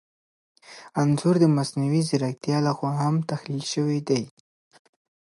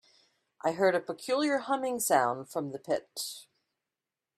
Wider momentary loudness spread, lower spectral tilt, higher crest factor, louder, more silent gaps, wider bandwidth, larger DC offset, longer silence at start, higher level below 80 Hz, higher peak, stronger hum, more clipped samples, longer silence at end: about the same, 10 LU vs 11 LU; first, -6.5 dB/octave vs -3.5 dB/octave; about the same, 18 dB vs 22 dB; first, -24 LUFS vs -30 LUFS; neither; second, 11.5 kHz vs 15.5 kHz; neither; about the same, 0.7 s vs 0.65 s; first, -68 dBFS vs -78 dBFS; about the same, -8 dBFS vs -10 dBFS; neither; neither; first, 1.1 s vs 0.95 s